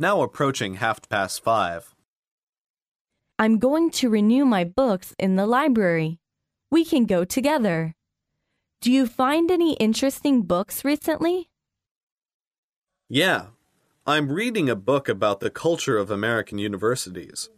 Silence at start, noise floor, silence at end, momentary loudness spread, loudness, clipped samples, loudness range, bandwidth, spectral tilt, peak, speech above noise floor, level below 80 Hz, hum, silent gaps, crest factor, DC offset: 0 s; -82 dBFS; 0.1 s; 8 LU; -22 LUFS; under 0.1%; 5 LU; 15.5 kHz; -5 dB/octave; -6 dBFS; 60 dB; -58 dBFS; none; 2.08-2.23 s, 2.31-2.53 s, 2.60-2.74 s, 2.87-3.05 s, 11.91-12.16 s, 12.34-12.40 s, 12.47-12.51 s, 12.58-12.82 s; 16 dB; under 0.1%